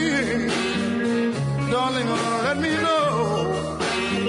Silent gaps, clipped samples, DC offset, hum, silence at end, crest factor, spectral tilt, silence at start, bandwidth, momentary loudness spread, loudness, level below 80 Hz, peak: none; under 0.1%; under 0.1%; none; 0 s; 12 dB; -5 dB/octave; 0 s; 11 kHz; 4 LU; -23 LUFS; -50 dBFS; -10 dBFS